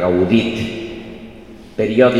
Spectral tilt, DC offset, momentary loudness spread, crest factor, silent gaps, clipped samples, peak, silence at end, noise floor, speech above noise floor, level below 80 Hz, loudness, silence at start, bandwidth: -7 dB/octave; 0.3%; 22 LU; 16 dB; none; under 0.1%; 0 dBFS; 0 s; -38 dBFS; 23 dB; -44 dBFS; -17 LUFS; 0 s; 10.5 kHz